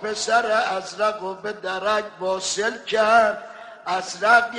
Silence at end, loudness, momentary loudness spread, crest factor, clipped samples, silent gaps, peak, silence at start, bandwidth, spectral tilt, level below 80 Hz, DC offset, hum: 0 s; -22 LUFS; 13 LU; 18 dB; under 0.1%; none; -4 dBFS; 0 s; 10.5 kHz; -1.5 dB/octave; -62 dBFS; under 0.1%; none